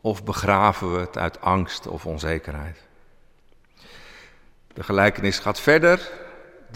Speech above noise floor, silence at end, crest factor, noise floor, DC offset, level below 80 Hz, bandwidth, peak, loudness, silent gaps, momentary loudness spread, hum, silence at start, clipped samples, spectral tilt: 32 dB; 0 s; 20 dB; -54 dBFS; under 0.1%; -44 dBFS; 16 kHz; -4 dBFS; -21 LUFS; none; 19 LU; none; 0.05 s; under 0.1%; -5.5 dB/octave